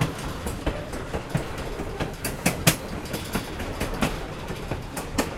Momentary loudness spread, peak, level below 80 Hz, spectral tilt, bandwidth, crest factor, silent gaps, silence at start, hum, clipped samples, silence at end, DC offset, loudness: 10 LU; -2 dBFS; -38 dBFS; -4 dB/octave; 16.5 kHz; 26 dB; none; 0 s; none; under 0.1%; 0 s; under 0.1%; -29 LUFS